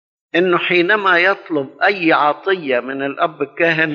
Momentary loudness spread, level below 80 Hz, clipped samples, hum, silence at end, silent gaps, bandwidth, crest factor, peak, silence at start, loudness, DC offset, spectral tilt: 8 LU; -78 dBFS; under 0.1%; none; 0 s; none; 6.6 kHz; 14 dB; -2 dBFS; 0.35 s; -16 LUFS; under 0.1%; -2 dB/octave